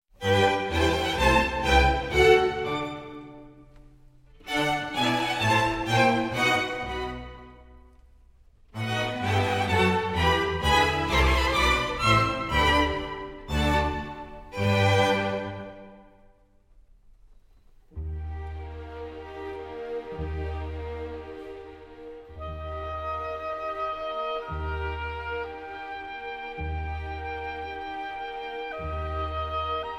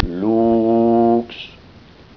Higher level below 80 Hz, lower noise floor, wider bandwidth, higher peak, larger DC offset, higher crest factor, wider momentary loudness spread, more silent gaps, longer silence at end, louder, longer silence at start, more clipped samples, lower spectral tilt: about the same, -38 dBFS vs -36 dBFS; first, -58 dBFS vs -44 dBFS; first, 16 kHz vs 5.4 kHz; about the same, -6 dBFS vs -4 dBFS; neither; first, 22 dB vs 14 dB; about the same, 18 LU vs 18 LU; neither; second, 0 s vs 0.7 s; second, -26 LUFS vs -16 LUFS; first, 0.2 s vs 0 s; neither; second, -5 dB/octave vs -9.5 dB/octave